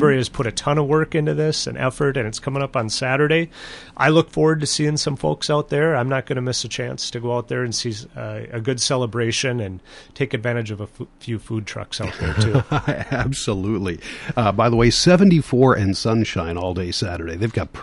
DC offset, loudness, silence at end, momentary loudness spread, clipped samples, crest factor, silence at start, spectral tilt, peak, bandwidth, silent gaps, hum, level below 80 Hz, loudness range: under 0.1%; -20 LUFS; 0 s; 12 LU; under 0.1%; 18 dB; 0 s; -5 dB/octave; -2 dBFS; 11.5 kHz; none; none; -40 dBFS; 6 LU